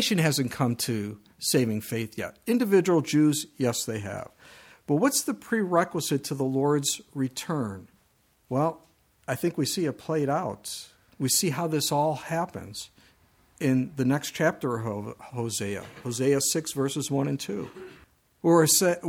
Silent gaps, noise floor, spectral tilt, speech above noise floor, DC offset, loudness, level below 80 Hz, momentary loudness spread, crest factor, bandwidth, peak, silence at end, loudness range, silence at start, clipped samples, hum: none; -66 dBFS; -4.5 dB/octave; 40 dB; under 0.1%; -27 LUFS; -66 dBFS; 14 LU; 20 dB; 18 kHz; -8 dBFS; 0 s; 4 LU; 0 s; under 0.1%; none